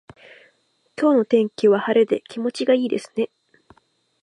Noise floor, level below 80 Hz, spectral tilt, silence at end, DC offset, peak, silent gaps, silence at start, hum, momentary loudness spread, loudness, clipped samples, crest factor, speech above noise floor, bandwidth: -64 dBFS; -70 dBFS; -6 dB/octave; 1 s; under 0.1%; -6 dBFS; none; 1 s; none; 10 LU; -20 LUFS; under 0.1%; 16 dB; 45 dB; 11 kHz